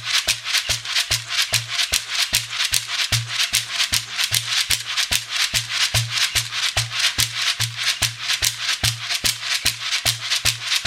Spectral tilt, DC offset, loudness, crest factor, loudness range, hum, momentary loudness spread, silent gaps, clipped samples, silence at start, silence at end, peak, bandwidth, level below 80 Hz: 0 dB/octave; under 0.1%; -19 LUFS; 22 dB; 1 LU; none; 2 LU; none; under 0.1%; 0 s; 0 s; 0 dBFS; 17 kHz; -44 dBFS